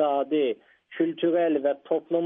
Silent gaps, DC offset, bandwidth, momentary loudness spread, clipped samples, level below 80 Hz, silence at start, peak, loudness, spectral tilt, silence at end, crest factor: none; under 0.1%; 3.8 kHz; 7 LU; under 0.1%; -80 dBFS; 0 s; -12 dBFS; -26 LUFS; -4.5 dB/octave; 0 s; 14 dB